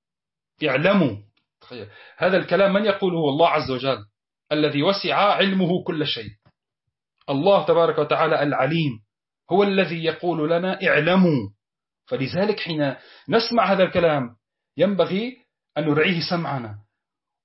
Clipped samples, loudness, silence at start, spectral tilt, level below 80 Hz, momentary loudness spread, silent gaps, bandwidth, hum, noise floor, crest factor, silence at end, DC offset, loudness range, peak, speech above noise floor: under 0.1%; -21 LUFS; 0.6 s; -9 dB/octave; -60 dBFS; 13 LU; none; 6 kHz; none; under -90 dBFS; 16 dB; 0.65 s; under 0.1%; 2 LU; -6 dBFS; over 69 dB